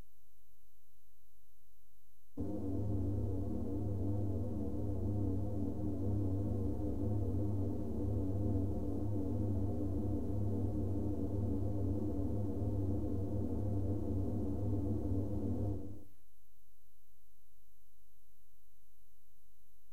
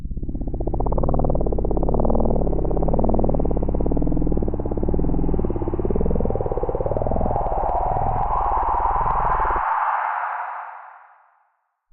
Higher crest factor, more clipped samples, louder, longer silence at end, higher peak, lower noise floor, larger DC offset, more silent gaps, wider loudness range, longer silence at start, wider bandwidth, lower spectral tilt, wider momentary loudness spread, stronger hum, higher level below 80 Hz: about the same, 14 dB vs 14 dB; neither; second, -39 LUFS vs -23 LUFS; first, 3.9 s vs 0.95 s; second, -24 dBFS vs -6 dBFS; first, -73 dBFS vs -68 dBFS; first, 1% vs under 0.1%; neither; first, 5 LU vs 2 LU; first, 2.35 s vs 0 s; second, 1.9 kHz vs 3 kHz; second, -11 dB/octave vs -12.5 dB/octave; about the same, 3 LU vs 5 LU; neither; second, -48 dBFS vs -24 dBFS